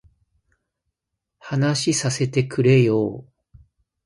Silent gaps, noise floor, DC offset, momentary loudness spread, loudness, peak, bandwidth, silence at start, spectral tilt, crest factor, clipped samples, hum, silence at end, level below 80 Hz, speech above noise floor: none; -82 dBFS; under 0.1%; 12 LU; -20 LUFS; -4 dBFS; 11.5 kHz; 1.45 s; -5.5 dB/octave; 18 dB; under 0.1%; none; 0.85 s; -58 dBFS; 63 dB